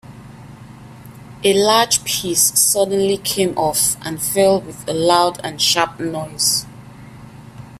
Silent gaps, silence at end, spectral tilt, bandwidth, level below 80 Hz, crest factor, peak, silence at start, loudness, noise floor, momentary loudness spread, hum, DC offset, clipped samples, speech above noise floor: none; 0 s; -2.5 dB/octave; 16 kHz; -50 dBFS; 18 dB; 0 dBFS; 0.05 s; -16 LUFS; -38 dBFS; 8 LU; 50 Hz at -45 dBFS; under 0.1%; under 0.1%; 21 dB